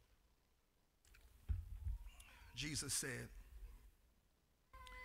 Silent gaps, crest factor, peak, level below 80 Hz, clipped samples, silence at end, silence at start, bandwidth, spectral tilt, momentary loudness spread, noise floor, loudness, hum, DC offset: none; 24 dB; -28 dBFS; -56 dBFS; under 0.1%; 0 s; 0 s; 16 kHz; -2.5 dB/octave; 22 LU; -79 dBFS; -47 LUFS; none; under 0.1%